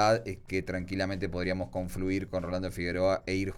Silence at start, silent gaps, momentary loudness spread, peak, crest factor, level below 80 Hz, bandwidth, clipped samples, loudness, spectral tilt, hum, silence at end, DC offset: 0 s; none; 6 LU; -14 dBFS; 16 dB; -48 dBFS; 16.5 kHz; under 0.1%; -32 LUFS; -6 dB/octave; none; 0 s; under 0.1%